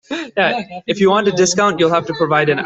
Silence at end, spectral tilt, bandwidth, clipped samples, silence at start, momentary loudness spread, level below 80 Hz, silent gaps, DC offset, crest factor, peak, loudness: 0 s; -4 dB/octave; 8.2 kHz; under 0.1%; 0.1 s; 8 LU; -56 dBFS; none; under 0.1%; 14 dB; -2 dBFS; -15 LUFS